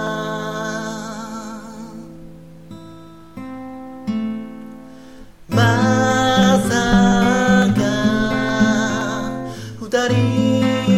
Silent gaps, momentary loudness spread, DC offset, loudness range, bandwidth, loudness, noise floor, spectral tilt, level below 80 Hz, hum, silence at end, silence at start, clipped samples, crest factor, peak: none; 21 LU; 0.5%; 16 LU; 15 kHz; -17 LUFS; -40 dBFS; -5.5 dB/octave; -40 dBFS; none; 0 s; 0 s; under 0.1%; 18 dB; -2 dBFS